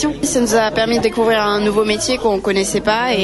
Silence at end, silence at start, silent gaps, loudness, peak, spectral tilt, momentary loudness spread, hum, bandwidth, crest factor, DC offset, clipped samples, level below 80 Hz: 0 s; 0 s; none; -16 LUFS; -2 dBFS; -3.5 dB/octave; 2 LU; none; 12 kHz; 12 dB; under 0.1%; under 0.1%; -40 dBFS